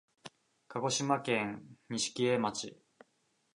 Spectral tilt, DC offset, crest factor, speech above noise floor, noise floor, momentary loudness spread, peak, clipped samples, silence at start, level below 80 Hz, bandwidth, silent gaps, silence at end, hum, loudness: -3.5 dB/octave; under 0.1%; 20 dB; 42 dB; -76 dBFS; 20 LU; -16 dBFS; under 0.1%; 0.25 s; -76 dBFS; 11 kHz; none; 0.8 s; none; -34 LUFS